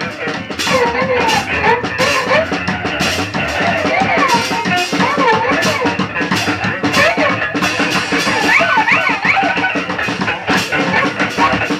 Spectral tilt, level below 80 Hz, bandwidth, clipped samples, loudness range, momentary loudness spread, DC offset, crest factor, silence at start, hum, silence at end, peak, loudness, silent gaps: -4 dB/octave; -42 dBFS; 16 kHz; under 0.1%; 2 LU; 6 LU; under 0.1%; 14 dB; 0 s; none; 0 s; 0 dBFS; -14 LUFS; none